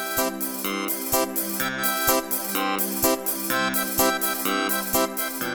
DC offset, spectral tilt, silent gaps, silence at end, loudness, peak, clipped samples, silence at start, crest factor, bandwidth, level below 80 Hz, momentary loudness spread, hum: under 0.1%; -2 dB/octave; none; 0 s; -23 LUFS; -6 dBFS; under 0.1%; 0 s; 18 dB; over 20 kHz; -54 dBFS; 5 LU; none